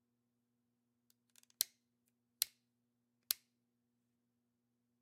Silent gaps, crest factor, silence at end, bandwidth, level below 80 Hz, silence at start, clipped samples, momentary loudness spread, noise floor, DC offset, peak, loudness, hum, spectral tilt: none; 40 dB; 1.7 s; 16 kHz; under -90 dBFS; 1.6 s; under 0.1%; 1 LU; -85 dBFS; under 0.1%; -10 dBFS; -41 LUFS; 60 Hz at -85 dBFS; 3 dB/octave